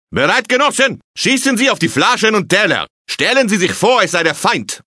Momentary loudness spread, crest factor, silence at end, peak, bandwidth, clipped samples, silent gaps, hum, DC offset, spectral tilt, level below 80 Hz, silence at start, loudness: 4 LU; 14 dB; 0.1 s; 0 dBFS; 11 kHz; under 0.1%; 1.04-1.14 s, 2.90-3.05 s; none; under 0.1%; -3 dB/octave; -54 dBFS; 0.1 s; -13 LUFS